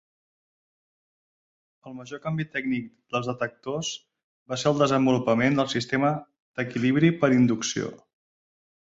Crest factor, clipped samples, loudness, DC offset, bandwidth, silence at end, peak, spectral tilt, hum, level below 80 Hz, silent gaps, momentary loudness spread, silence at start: 20 dB; under 0.1%; -25 LUFS; under 0.1%; 7.8 kHz; 0.85 s; -6 dBFS; -5.5 dB/octave; none; -64 dBFS; 4.24-4.46 s, 6.40-6.54 s; 14 LU; 1.85 s